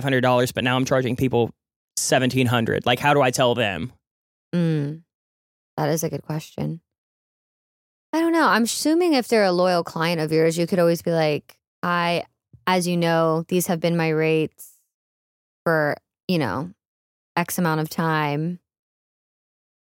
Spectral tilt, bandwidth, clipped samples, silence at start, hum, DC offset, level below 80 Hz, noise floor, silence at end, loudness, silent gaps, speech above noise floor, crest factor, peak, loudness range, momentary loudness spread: -5 dB/octave; 17 kHz; under 0.1%; 0 s; none; under 0.1%; -60 dBFS; under -90 dBFS; 1.35 s; -22 LUFS; 1.76-1.88 s, 4.07-4.52 s, 5.15-5.77 s, 6.98-8.13 s, 11.67-11.82 s, 14.94-15.66 s, 16.23-16.28 s, 16.87-17.35 s; over 69 dB; 18 dB; -4 dBFS; 7 LU; 12 LU